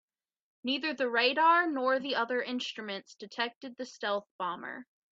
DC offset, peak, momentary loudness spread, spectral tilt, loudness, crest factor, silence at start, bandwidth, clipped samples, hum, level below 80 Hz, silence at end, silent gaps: under 0.1%; -12 dBFS; 17 LU; -3 dB/octave; -31 LUFS; 20 dB; 0.65 s; 7.8 kHz; under 0.1%; none; -84 dBFS; 0.35 s; 3.56-3.61 s, 4.31-4.39 s